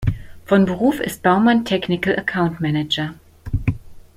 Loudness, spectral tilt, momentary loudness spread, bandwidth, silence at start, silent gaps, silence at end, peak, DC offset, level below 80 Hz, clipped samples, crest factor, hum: -19 LUFS; -6.5 dB/octave; 13 LU; 16 kHz; 0 s; none; 0.15 s; -2 dBFS; under 0.1%; -36 dBFS; under 0.1%; 18 dB; none